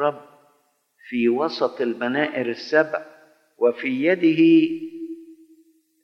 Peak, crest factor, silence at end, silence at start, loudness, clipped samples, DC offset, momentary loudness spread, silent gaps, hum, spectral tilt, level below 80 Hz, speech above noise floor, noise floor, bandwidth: -4 dBFS; 18 dB; 0.7 s; 0 s; -21 LUFS; under 0.1%; under 0.1%; 18 LU; none; none; -7 dB/octave; -84 dBFS; 45 dB; -65 dBFS; 6.2 kHz